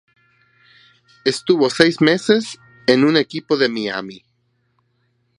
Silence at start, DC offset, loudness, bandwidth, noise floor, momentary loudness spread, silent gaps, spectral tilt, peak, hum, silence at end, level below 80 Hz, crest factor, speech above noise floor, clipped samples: 1.25 s; under 0.1%; -17 LUFS; 11.5 kHz; -65 dBFS; 11 LU; none; -5 dB/octave; 0 dBFS; none; 1.2 s; -64 dBFS; 20 dB; 49 dB; under 0.1%